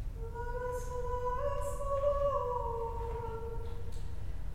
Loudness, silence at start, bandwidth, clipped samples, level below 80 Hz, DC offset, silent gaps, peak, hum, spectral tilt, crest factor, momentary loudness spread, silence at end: -37 LUFS; 0 s; 16 kHz; under 0.1%; -40 dBFS; under 0.1%; none; -20 dBFS; none; -6.5 dB/octave; 14 dB; 12 LU; 0 s